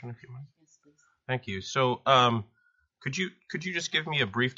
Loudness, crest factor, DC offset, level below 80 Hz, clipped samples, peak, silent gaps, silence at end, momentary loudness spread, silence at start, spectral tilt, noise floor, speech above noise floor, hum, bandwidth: -28 LUFS; 24 dB; under 0.1%; -68 dBFS; under 0.1%; -6 dBFS; none; 0.05 s; 22 LU; 0 s; -2.5 dB/octave; -65 dBFS; 36 dB; none; 7.6 kHz